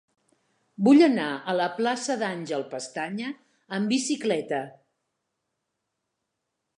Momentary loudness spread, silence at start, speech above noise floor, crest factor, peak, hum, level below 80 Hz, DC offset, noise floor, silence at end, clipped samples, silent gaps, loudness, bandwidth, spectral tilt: 16 LU; 0.8 s; 57 dB; 20 dB; -8 dBFS; none; -82 dBFS; under 0.1%; -81 dBFS; 2.1 s; under 0.1%; none; -25 LUFS; 11 kHz; -4.5 dB/octave